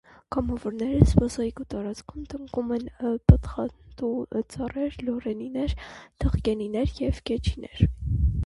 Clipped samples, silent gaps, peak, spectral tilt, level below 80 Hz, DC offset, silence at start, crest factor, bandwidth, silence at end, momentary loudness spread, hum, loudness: under 0.1%; none; 0 dBFS; -8 dB/octave; -32 dBFS; under 0.1%; 0.3 s; 26 dB; 11.5 kHz; 0 s; 13 LU; none; -27 LUFS